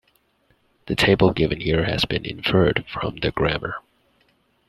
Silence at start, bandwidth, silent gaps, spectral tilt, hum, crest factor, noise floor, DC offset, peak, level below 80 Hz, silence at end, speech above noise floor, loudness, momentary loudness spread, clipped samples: 0.85 s; 13 kHz; none; -6 dB/octave; none; 20 dB; -64 dBFS; under 0.1%; -2 dBFS; -42 dBFS; 0.9 s; 43 dB; -21 LUFS; 11 LU; under 0.1%